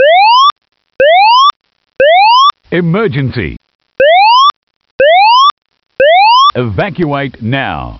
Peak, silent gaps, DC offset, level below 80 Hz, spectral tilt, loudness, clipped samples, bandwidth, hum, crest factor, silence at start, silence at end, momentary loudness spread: 0 dBFS; 0.52-0.56 s, 1.56-1.60 s, 3.75-3.79 s, 4.56-4.67 s, 4.76-4.80 s, 4.91-4.99 s, 5.51-5.62 s; under 0.1%; -40 dBFS; -2 dB/octave; -8 LUFS; under 0.1%; 6.4 kHz; none; 8 dB; 0 s; 0 s; 10 LU